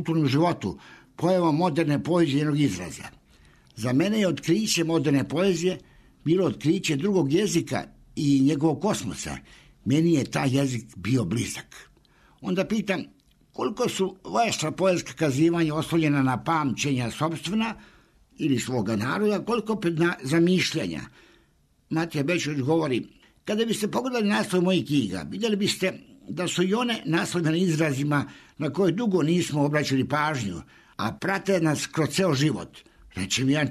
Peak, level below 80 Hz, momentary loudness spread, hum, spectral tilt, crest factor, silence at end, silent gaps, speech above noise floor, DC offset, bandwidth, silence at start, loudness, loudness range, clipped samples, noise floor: -12 dBFS; -58 dBFS; 10 LU; none; -5.5 dB/octave; 14 dB; 0 s; none; 39 dB; under 0.1%; 13.5 kHz; 0 s; -25 LUFS; 3 LU; under 0.1%; -63 dBFS